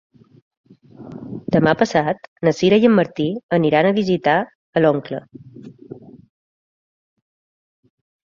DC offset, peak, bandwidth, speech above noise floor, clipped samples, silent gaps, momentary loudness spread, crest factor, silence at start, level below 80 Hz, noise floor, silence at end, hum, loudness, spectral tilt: under 0.1%; -2 dBFS; 7.6 kHz; 23 dB; under 0.1%; 2.28-2.36 s, 3.43-3.49 s, 4.55-4.73 s; 23 LU; 18 dB; 1 s; -58 dBFS; -39 dBFS; 2.3 s; none; -17 LUFS; -7 dB/octave